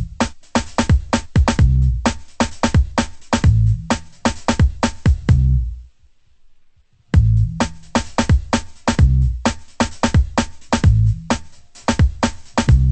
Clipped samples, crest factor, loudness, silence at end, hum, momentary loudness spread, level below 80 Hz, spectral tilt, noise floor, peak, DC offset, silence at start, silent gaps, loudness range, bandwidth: under 0.1%; 16 dB; -18 LUFS; 0 s; none; 8 LU; -22 dBFS; -6 dB/octave; -51 dBFS; -2 dBFS; under 0.1%; 0 s; none; 2 LU; 8.8 kHz